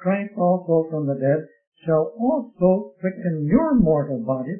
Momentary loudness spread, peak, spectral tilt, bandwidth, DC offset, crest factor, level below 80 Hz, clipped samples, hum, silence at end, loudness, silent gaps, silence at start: 7 LU; -4 dBFS; -14 dB/octave; 3.3 kHz; under 0.1%; 18 dB; -46 dBFS; under 0.1%; none; 0 s; -21 LUFS; 1.67-1.72 s; 0 s